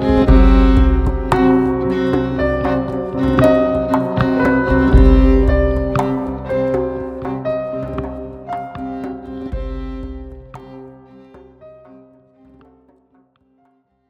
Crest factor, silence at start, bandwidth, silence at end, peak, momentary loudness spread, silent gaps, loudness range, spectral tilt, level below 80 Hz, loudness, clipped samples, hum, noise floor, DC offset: 16 dB; 0 s; 8 kHz; 2.4 s; 0 dBFS; 17 LU; none; 17 LU; -8.5 dB/octave; -20 dBFS; -16 LUFS; under 0.1%; none; -59 dBFS; under 0.1%